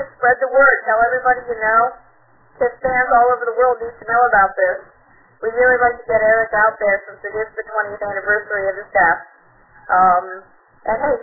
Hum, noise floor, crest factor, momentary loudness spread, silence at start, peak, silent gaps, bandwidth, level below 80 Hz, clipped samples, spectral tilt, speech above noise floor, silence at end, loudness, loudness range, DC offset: none; -53 dBFS; 16 dB; 11 LU; 0 s; 0 dBFS; none; 2.2 kHz; -50 dBFS; under 0.1%; -11 dB/octave; 37 dB; 0 s; -16 LUFS; 3 LU; under 0.1%